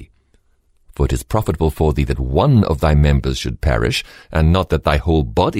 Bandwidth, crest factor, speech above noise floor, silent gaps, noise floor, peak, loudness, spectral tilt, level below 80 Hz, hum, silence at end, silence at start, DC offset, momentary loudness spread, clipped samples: 16 kHz; 14 dB; 42 dB; none; -57 dBFS; -2 dBFS; -17 LUFS; -6.5 dB/octave; -22 dBFS; none; 0 s; 0 s; under 0.1%; 7 LU; under 0.1%